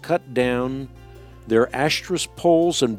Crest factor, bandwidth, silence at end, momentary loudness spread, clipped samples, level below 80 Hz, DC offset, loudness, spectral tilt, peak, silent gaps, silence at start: 16 dB; 15.5 kHz; 0 s; 10 LU; under 0.1%; -48 dBFS; under 0.1%; -21 LUFS; -4.5 dB/octave; -6 dBFS; none; 0.05 s